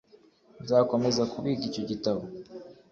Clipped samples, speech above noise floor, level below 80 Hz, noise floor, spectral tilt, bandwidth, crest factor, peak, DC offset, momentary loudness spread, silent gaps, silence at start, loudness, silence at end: under 0.1%; 31 dB; -64 dBFS; -59 dBFS; -6 dB/octave; 7.6 kHz; 20 dB; -10 dBFS; under 0.1%; 20 LU; none; 0.6 s; -28 LUFS; 0.2 s